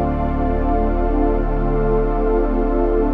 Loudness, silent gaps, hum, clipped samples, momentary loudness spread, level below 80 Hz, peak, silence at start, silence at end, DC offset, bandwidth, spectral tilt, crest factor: -19 LUFS; none; none; under 0.1%; 2 LU; -20 dBFS; -6 dBFS; 0 s; 0 s; under 0.1%; 3.7 kHz; -11 dB/octave; 10 dB